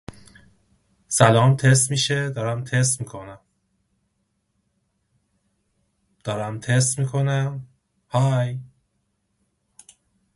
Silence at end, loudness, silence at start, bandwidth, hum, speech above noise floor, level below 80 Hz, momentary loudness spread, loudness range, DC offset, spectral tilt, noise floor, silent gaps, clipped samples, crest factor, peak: 1.7 s; -21 LUFS; 0.1 s; 11.5 kHz; none; 52 dB; -58 dBFS; 19 LU; 11 LU; under 0.1%; -4.5 dB/octave; -72 dBFS; none; under 0.1%; 24 dB; 0 dBFS